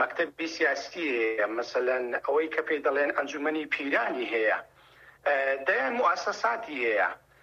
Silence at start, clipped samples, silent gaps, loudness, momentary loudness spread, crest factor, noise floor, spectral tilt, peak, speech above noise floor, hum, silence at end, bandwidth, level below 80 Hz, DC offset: 0 s; under 0.1%; none; -28 LUFS; 4 LU; 16 dB; -56 dBFS; -3 dB/octave; -12 dBFS; 27 dB; none; 0.25 s; 8 kHz; -72 dBFS; under 0.1%